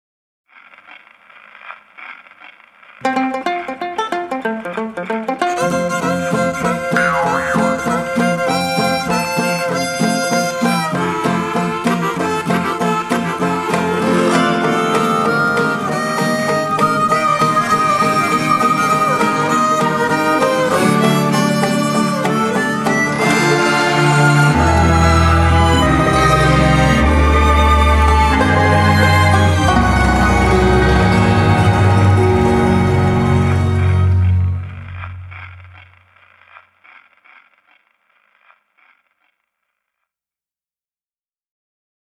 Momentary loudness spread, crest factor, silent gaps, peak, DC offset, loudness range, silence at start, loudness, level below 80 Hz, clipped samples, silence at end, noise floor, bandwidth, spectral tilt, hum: 9 LU; 14 dB; none; 0 dBFS; under 0.1%; 8 LU; 1.65 s; -14 LUFS; -26 dBFS; under 0.1%; 6.5 s; under -90 dBFS; 14.5 kHz; -5.5 dB/octave; none